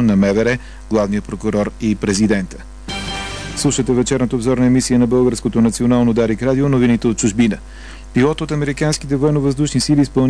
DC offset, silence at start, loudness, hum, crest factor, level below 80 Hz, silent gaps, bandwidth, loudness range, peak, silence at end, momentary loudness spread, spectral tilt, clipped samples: 0.4%; 0 s; -16 LUFS; none; 14 dB; -34 dBFS; none; 11 kHz; 4 LU; -2 dBFS; 0 s; 10 LU; -5.5 dB/octave; under 0.1%